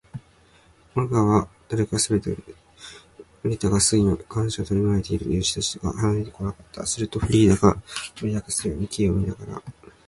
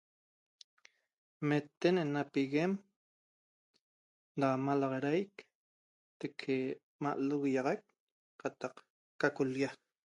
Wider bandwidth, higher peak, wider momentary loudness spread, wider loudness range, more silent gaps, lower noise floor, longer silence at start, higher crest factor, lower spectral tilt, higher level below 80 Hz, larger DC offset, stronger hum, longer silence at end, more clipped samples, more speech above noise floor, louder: about the same, 11.5 kHz vs 10.5 kHz; first, -2 dBFS vs -16 dBFS; first, 17 LU vs 11 LU; about the same, 2 LU vs 2 LU; second, none vs 1.77-1.81 s, 2.96-3.74 s, 3.81-4.35 s, 5.55-6.20 s, 6.83-6.99 s, 8.00-8.39 s, 8.90-9.19 s; second, -56 dBFS vs under -90 dBFS; second, 0.15 s vs 1.4 s; about the same, 22 dB vs 22 dB; second, -5 dB/octave vs -7 dB/octave; first, -40 dBFS vs -84 dBFS; neither; neither; about the same, 0.35 s vs 0.45 s; neither; second, 33 dB vs over 56 dB; first, -23 LUFS vs -36 LUFS